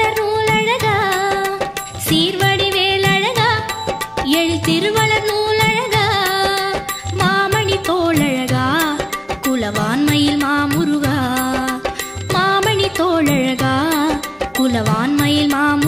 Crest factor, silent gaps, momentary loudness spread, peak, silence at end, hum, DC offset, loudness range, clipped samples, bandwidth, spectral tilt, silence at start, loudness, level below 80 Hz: 14 dB; none; 7 LU; -2 dBFS; 0 s; none; under 0.1%; 2 LU; under 0.1%; 16.5 kHz; -4.5 dB/octave; 0 s; -16 LUFS; -42 dBFS